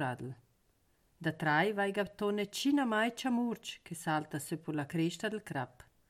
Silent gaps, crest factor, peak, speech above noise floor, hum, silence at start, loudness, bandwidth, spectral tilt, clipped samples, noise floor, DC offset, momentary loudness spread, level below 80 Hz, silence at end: none; 18 dB; -18 dBFS; 39 dB; none; 0 s; -35 LUFS; 16 kHz; -5 dB/octave; under 0.1%; -73 dBFS; under 0.1%; 12 LU; -72 dBFS; 0.4 s